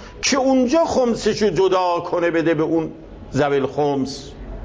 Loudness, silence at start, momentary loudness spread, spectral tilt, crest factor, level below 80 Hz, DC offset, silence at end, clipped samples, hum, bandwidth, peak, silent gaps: -19 LUFS; 0 s; 11 LU; -4.5 dB/octave; 12 dB; -42 dBFS; under 0.1%; 0 s; under 0.1%; none; 8 kHz; -6 dBFS; none